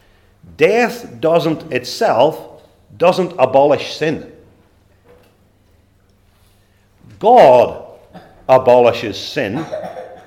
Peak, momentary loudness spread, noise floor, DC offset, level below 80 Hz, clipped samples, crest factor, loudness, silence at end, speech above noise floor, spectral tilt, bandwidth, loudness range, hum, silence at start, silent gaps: 0 dBFS; 17 LU; -53 dBFS; under 0.1%; -56 dBFS; under 0.1%; 16 dB; -14 LUFS; 0.1 s; 40 dB; -5.5 dB/octave; 16.5 kHz; 7 LU; none; 0.6 s; none